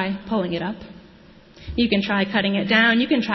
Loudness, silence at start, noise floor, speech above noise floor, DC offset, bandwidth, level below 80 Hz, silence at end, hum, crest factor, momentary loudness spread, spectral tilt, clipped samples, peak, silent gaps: -20 LUFS; 0 s; -48 dBFS; 27 dB; under 0.1%; 6 kHz; -46 dBFS; 0 s; none; 18 dB; 13 LU; -6.5 dB/octave; under 0.1%; -4 dBFS; none